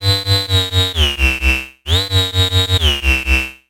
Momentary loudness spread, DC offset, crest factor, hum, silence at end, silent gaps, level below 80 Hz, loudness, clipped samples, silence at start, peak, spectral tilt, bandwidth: 3 LU; under 0.1%; 14 dB; none; 0.15 s; none; -22 dBFS; -14 LUFS; under 0.1%; 0 s; 0 dBFS; -3.5 dB/octave; 16.5 kHz